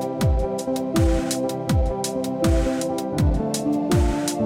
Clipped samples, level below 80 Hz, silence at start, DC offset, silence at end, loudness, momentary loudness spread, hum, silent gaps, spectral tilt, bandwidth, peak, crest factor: under 0.1%; -28 dBFS; 0 s; under 0.1%; 0 s; -23 LUFS; 4 LU; none; none; -6 dB/octave; 16.5 kHz; -8 dBFS; 14 dB